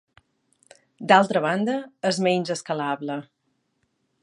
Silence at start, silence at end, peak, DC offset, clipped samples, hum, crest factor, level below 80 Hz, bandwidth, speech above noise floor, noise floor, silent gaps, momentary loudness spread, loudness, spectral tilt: 1 s; 1 s; -2 dBFS; under 0.1%; under 0.1%; none; 24 dB; -74 dBFS; 11.5 kHz; 50 dB; -73 dBFS; none; 14 LU; -23 LUFS; -5 dB/octave